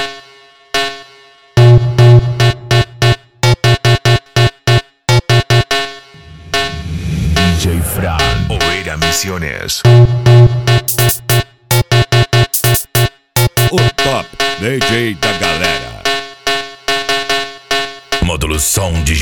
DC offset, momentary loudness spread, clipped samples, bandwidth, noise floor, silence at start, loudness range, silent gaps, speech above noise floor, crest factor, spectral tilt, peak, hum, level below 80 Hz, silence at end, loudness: 1%; 9 LU; under 0.1%; 19.5 kHz; -42 dBFS; 0 s; 5 LU; none; 31 dB; 12 dB; -4.5 dB/octave; 0 dBFS; none; -28 dBFS; 0 s; -12 LUFS